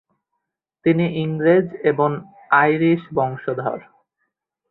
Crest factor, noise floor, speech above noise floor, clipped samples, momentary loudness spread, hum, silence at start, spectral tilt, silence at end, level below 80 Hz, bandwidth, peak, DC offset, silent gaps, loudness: 18 dB; -78 dBFS; 60 dB; under 0.1%; 9 LU; none; 0.85 s; -11.5 dB/octave; 0.9 s; -62 dBFS; 4.2 kHz; -2 dBFS; under 0.1%; none; -19 LUFS